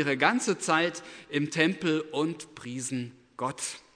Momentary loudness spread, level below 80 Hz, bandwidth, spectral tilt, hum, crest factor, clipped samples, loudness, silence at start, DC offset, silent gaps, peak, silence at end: 13 LU; -74 dBFS; 11 kHz; -4 dB/octave; none; 22 dB; under 0.1%; -29 LUFS; 0 s; under 0.1%; none; -6 dBFS; 0.15 s